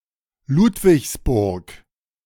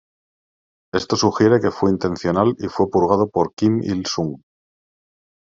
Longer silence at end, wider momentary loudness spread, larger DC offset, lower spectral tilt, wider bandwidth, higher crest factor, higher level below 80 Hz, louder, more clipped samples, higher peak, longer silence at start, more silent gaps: second, 0.5 s vs 1.05 s; about the same, 9 LU vs 9 LU; neither; about the same, -6.5 dB/octave vs -6 dB/octave; first, 18.5 kHz vs 7.6 kHz; about the same, 16 dB vs 18 dB; first, -36 dBFS vs -56 dBFS; about the same, -18 LUFS vs -19 LUFS; neither; about the same, -4 dBFS vs -2 dBFS; second, 0.5 s vs 0.95 s; second, none vs 3.53-3.57 s